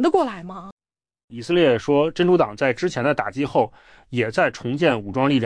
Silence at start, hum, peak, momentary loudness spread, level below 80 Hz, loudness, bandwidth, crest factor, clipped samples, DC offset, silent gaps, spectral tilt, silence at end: 0 s; none; -6 dBFS; 14 LU; -54 dBFS; -21 LUFS; 10 kHz; 16 dB; under 0.1%; under 0.1%; 0.72-0.77 s, 1.24-1.28 s; -6.5 dB/octave; 0 s